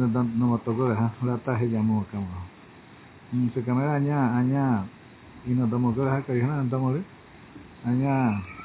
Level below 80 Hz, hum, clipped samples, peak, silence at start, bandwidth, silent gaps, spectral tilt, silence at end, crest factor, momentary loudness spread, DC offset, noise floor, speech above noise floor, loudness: -54 dBFS; none; under 0.1%; -12 dBFS; 0 s; 4 kHz; none; -13 dB/octave; 0 s; 14 dB; 10 LU; under 0.1%; -49 dBFS; 24 dB; -26 LUFS